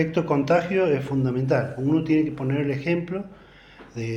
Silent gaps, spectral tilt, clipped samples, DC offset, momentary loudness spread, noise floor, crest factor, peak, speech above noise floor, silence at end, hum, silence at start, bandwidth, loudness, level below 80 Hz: none; -8 dB/octave; under 0.1%; under 0.1%; 12 LU; -48 dBFS; 16 dB; -8 dBFS; 25 dB; 0 s; none; 0 s; 8.4 kHz; -23 LUFS; -56 dBFS